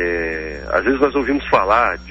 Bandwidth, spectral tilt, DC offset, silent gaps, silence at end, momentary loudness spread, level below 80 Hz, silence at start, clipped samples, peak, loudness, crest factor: 7.8 kHz; -6.5 dB/octave; under 0.1%; none; 0 s; 8 LU; -36 dBFS; 0 s; under 0.1%; -2 dBFS; -17 LUFS; 16 dB